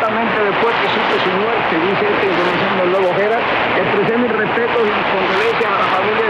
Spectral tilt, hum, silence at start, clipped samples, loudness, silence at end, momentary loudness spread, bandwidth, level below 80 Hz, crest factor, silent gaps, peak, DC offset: -6 dB/octave; none; 0 s; under 0.1%; -15 LUFS; 0 s; 1 LU; 9.8 kHz; -50 dBFS; 10 dB; none; -4 dBFS; under 0.1%